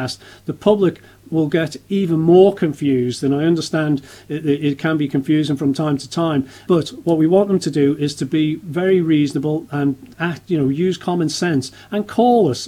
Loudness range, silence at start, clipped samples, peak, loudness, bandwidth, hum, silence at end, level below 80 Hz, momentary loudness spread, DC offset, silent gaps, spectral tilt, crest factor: 2 LU; 0 s; under 0.1%; 0 dBFS; -18 LUFS; 15 kHz; none; 0 s; -56 dBFS; 8 LU; under 0.1%; none; -6.5 dB/octave; 16 dB